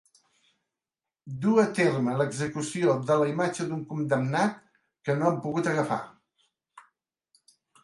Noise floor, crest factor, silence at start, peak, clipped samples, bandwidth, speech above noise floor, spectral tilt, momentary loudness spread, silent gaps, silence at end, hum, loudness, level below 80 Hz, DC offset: under -90 dBFS; 20 dB; 1.25 s; -10 dBFS; under 0.1%; 11.5 kHz; over 64 dB; -6 dB/octave; 9 LU; none; 1.05 s; none; -27 LUFS; -70 dBFS; under 0.1%